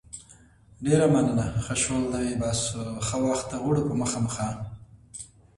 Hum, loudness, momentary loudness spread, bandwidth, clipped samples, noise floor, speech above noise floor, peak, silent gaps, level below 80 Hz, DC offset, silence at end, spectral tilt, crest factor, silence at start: none; -26 LUFS; 20 LU; 11.5 kHz; under 0.1%; -54 dBFS; 29 dB; -8 dBFS; none; -48 dBFS; under 0.1%; 0.3 s; -5 dB/octave; 20 dB; 0.15 s